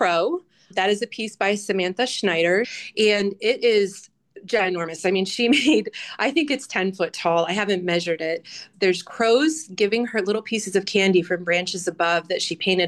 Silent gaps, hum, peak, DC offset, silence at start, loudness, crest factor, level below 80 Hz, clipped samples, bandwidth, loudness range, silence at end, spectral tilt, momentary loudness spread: none; none; -8 dBFS; under 0.1%; 0 s; -22 LUFS; 14 dB; -70 dBFS; under 0.1%; 12.5 kHz; 1 LU; 0 s; -4 dB/octave; 7 LU